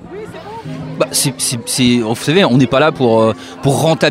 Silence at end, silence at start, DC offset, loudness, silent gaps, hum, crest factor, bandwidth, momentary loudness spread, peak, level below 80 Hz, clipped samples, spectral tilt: 0 s; 0 s; under 0.1%; -13 LUFS; none; none; 14 dB; 16 kHz; 17 LU; 0 dBFS; -46 dBFS; under 0.1%; -4.5 dB/octave